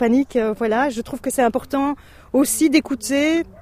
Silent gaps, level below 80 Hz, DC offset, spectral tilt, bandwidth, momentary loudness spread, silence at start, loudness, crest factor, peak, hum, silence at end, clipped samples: none; -48 dBFS; under 0.1%; -3.5 dB/octave; 15.5 kHz; 7 LU; 0 s; -20 LUFS; 16 dB; -4 dBFS; none; 0.15 s; under 0.1%